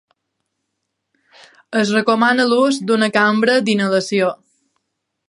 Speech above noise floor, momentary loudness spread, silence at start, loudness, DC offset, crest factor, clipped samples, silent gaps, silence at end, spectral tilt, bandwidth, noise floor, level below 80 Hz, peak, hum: 60 dB; 6 LU; 1.7 s; -16 LUFS; under 0.1%; 18 dB; under 0.1%; none; 0.95 s; -4.5 dB/octave; 11.5 kHz; -75 dBFS; -70 dBFS; 0 dBFS; none